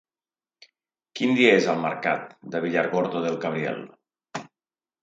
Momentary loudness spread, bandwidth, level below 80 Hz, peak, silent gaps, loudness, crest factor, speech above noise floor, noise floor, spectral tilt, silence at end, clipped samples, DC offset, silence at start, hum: 20 LU; 8 kHz; -74 dBFS; -4 dBFS; none; -24 LUFS; 22 dB; over 67 dB; under -90 dBFS; -5 dB/octave; 0.55 s; under 0.1%; under 0.1%; 1.15 s; none